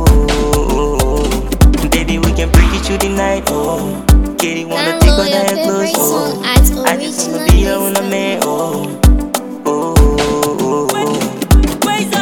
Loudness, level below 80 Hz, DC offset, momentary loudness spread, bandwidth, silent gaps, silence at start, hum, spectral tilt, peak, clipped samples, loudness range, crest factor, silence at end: -13 LUFS; -16 dBFS; under 0.1%; 6 LU; 19 kHz; none; 0 s; none; -5 dB/octave; 0 dBFS; under 0.1%; 2 LU; 12 dB; 0 s